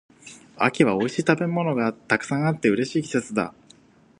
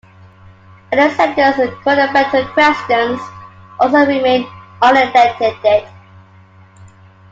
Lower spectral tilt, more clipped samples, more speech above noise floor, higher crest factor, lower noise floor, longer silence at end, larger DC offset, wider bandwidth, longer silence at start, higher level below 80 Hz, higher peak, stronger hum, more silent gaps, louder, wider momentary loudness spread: about the same, -6 dB/octave vs -5 dB/octave; neither; about the same, 31 dB vs 31 dB; first, 22 dB vs 14 dB; first, -54 dBFS vs -43 dBFS; first, 0.7 s vs 0.5 s; neither; first, 11 kHz vs 7.8 kHz; second, 0.25 s vs 0.9 s; second, -64 dBFS vs -54 dBFS; about the same, -2 dBFS vs 0 dBFS; neither; neither; second, -23 LUFS vs -13 LUFS; about the same, 7 LU vs 8 LU